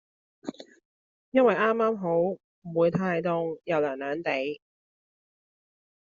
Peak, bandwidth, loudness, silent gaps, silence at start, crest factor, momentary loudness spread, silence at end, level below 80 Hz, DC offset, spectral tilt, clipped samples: -10 dBFS; 7.2 kHz; -27 LUFS; 0.85-1.32 s, 2.44-2.62 s; 0.45 s; 20 dB; 18 LU; 1.45 s; -70 dBFS; under 0.1%; -5 dB/octave; under 0.1%